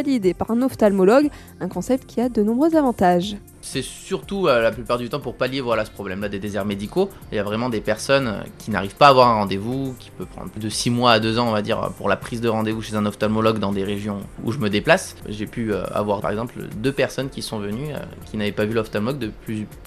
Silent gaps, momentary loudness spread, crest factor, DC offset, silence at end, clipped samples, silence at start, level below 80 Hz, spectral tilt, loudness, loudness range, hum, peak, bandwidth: none; 13 LU; 22 dB; under 0.1%; 0 s; under 0.1%; 0 s; -46 dBFS; -5.5 dB/octave; -21 LUFS; 6 LU; none; 0 dBFS; 14 kHz